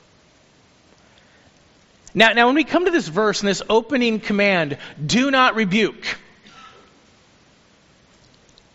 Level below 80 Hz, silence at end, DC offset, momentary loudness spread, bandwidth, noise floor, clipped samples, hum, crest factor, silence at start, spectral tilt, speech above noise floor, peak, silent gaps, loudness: -54 dBFS; 2.05 s; under 0.1%; 13 LU; 8 kHz; -54 dBFS; under 0.1%; none; 22 dB; 2.15 s; -2.5 dB/octave; 36 dB; 0 dBFS; none; -18 LUFS